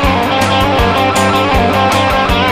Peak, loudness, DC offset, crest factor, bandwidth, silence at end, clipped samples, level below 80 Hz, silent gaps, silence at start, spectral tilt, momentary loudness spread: 0 dBFS; -11 LUFS; under 0.1%; 10 dB; 15.5 kHz; 0 s; under 0.1%; -24 dBFS; none; 0 s; -4.5 dB/octave; 1 LU